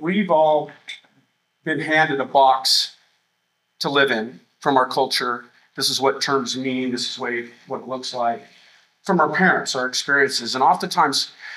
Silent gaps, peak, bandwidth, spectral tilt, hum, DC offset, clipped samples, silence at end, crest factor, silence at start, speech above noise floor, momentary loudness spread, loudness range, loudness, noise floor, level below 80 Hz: none; -2 dBFS; 16 kHz; -3 dB/octave; 60 Hz at -60 dBFS; under 0.1%; under 0.1%; 0 s; 20 dB; 0 s; 51 dB; 16 LU; 4 LU; -20 LUFS; -71 dBFS; -78 dBFS